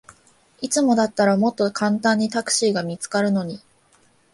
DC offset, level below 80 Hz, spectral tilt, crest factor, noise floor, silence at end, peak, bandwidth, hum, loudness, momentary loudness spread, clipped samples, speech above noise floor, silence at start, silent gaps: under 0.1%; -64 dBFS; -4 dB/octave; 16 dB; -58 dBFS; 0.75 s; -4 dBFS; 11.5 kHz; none; -20 LUFS; 7 LU; under 0.1%; 38 dB; 0.6 s; none